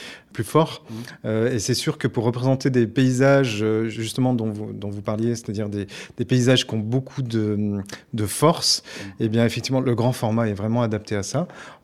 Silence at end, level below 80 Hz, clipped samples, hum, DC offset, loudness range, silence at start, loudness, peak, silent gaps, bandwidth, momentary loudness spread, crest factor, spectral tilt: 0.1 s; -58 dBFS; under 0.1%; none; under 0.1%; 3 LU; 0 s; -22 LUFS; -2 dBFS; none; 15.5 kHz; 13 LU; 20 dB; -5.5 dB/octave